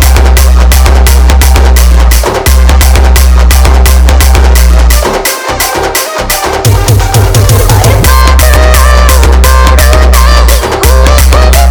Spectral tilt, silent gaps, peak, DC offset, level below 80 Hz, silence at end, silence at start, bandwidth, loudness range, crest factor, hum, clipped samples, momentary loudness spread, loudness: -4.5 dB/octave; none; 0 dBFS; under 0.1%; -4 dBFS; 0 s; 0 s; over 20 kHz; 2 LU; 2 dB; none; 30%; 4 LU; -5 LUFS